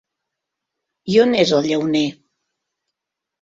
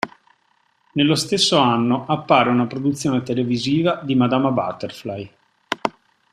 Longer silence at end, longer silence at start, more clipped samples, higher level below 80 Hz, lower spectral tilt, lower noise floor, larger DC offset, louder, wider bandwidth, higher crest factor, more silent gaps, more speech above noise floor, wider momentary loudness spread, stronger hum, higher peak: first, 1.3 s vs 0.45 s; first, 1.05 s vs 0.05 s; neither; about the same, -60 dBFS vs -58 dBFS; about the same, -5 dB/octave vs -5 dB/octave; first, -83 dBFS vs -63 dBFS; neither; about the same, -17 LUFS vs -19 LUFS; second, 7.8 kHz vs 14 kHz; about the same, 20 dB vs 20 dB; neither; first, 67 dB vs 45 dB; second, 9 LU vs 14 LU; neither; about the same, -2 dBFS vs 0 dBFS